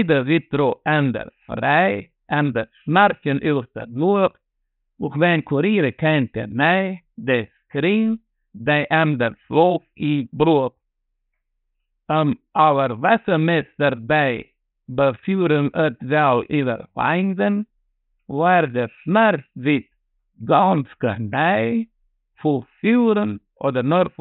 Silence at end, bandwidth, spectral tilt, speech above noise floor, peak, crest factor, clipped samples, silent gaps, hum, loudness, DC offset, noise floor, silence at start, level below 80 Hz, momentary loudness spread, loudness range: 0.1 s; 4.2 kHz; -11.5 dB/octave; 55 dB; -2 dBFS; 18 dB; under 0.1%; none; none; -20 LUFS; under 0.1%; -74 dBFS; 0 s; -56 dBFS; 9 LU; 1 LU